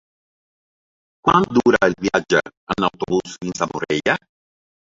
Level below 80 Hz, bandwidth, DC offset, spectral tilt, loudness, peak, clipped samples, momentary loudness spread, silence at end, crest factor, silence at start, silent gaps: -52 dBFS; 7.8 kHz; under 0.1%; -5 dB/octave; -19 LUFS; -2 dBFS; under 0.1%; 9 LU; 0.75 s; 20 dB; 1.25 s; 2.57-2.67 s